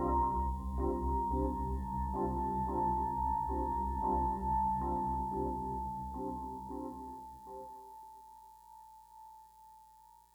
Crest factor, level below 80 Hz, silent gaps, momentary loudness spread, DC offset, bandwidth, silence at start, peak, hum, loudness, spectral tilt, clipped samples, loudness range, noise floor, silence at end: 14 dB; -44 dBFS; none; 22 LU; under 0.1%; 19.5 kHz; 0 s; -22 dBFS; 60 Hz at -70 dBFS; -36 LUFS; -9.5 dB/octave; under 0.1%; 15 LU; -61 dBFS; 0.3 s